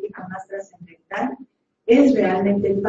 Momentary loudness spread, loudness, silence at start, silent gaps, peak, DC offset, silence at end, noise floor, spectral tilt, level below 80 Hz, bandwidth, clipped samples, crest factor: 19 LU; -18 LUFS; 0 s; none; -4 dBFS; under 0.1%; 0 s; -48 dBFS; -7.5 dB/octave; -58 dBFS; 7.6 kHz; under 0.1%; 16 dB